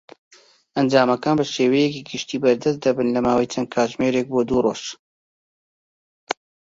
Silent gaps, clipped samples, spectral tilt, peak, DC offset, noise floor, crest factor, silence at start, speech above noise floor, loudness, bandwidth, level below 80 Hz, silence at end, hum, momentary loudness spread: 4.99-6.27 s; under 0.1%; -5 dB/octave; -2 dBFS; under 0.1%; under -90 dBFS; 18 dB; 0.75 s; over 70 dB; -21 LUFS; 7.8 kHz; -56 dBFS; 0.35 s; none; 12 LU